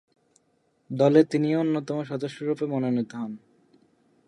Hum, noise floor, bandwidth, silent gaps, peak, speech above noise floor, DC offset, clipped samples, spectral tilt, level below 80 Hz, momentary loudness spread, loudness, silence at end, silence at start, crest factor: none; -69 dBFS; 11 kHz; none; -6 dBFS; 45 dB; under 0.1%; under 0.1%; -8 dB/octave; -76 dBFS; 16 LU; -25 LUFS; 0.9 s; 0.9 s; 20 dB